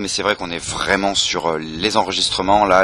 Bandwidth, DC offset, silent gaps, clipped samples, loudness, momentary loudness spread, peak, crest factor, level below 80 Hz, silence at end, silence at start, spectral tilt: 13.5 kHz; under 0.1%; none; under 0.1%; -18 LUFS; 7 LU; 0 dBFS; 18 dB; -42 dBFS; 0 s; 0 s; -2.5 dB/octave